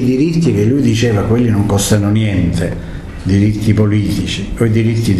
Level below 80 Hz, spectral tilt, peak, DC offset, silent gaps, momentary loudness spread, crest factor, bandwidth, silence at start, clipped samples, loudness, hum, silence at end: -30 dBFS; -6.5 dB/octave; 0 dBFS; under 0.1%; none; 7 LU; 12 dB; 13 kHz; 0 s; under 0.1%; -13 LUFS; none; 0 s